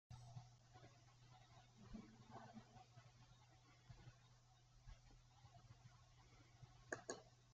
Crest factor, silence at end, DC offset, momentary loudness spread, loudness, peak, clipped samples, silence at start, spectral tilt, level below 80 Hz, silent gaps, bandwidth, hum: 32 dB; 0 s; under 0.1%; 14 LU; -62 LUFS; -30 dBFS; under 0.1%; 0.1 s; -4.5 dB/octave; -74 dBFS; none; 7.6 kHz; none